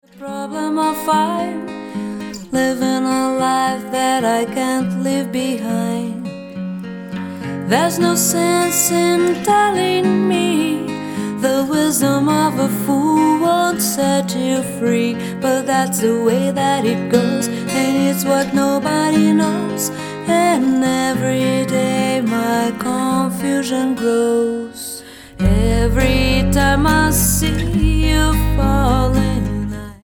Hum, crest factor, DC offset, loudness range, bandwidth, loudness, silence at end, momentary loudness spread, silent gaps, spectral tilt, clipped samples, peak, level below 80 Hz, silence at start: none; 16 dB; under 0.1%; 4 LU; 19 kHz; -17 LUFS; 0.1 s; 11 LU; none; -5 dB/octave; under 0.1%; 0 dBFS; -28 dBFS; 0.15 s